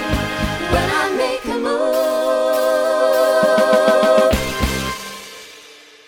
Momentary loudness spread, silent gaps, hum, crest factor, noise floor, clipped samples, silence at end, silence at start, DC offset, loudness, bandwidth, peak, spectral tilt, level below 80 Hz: 14 LU; none; none; 16 dB; -43 dBFS; under 0.1%; 0.35 s; 0 s; under 0.1%; -16 LUFS; 19 kHz; -2 dBFS; -4.5 dB/octave; -32 dBFS